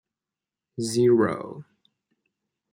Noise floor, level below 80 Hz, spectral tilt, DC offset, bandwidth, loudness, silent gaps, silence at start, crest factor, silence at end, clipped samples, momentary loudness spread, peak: -89 dBFS; -70 dBFS; -6 dB/octave; under 0.1%; 16 kHz; -23 LUFS; none; 0.8 s; 18 dB; 1.1 s; under 0.1%; 22 LU; -10 dBFS